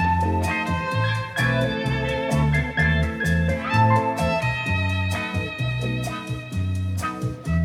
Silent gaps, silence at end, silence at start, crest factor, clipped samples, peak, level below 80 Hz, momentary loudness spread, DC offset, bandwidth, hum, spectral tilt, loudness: none; 0 s; 0 s; 16 dB; under 0.1%; -6 dBFS; -36 dBFS; 7 LU; under 0.1%; 15 kHz; none; -6 dB/octave; -23 LUFS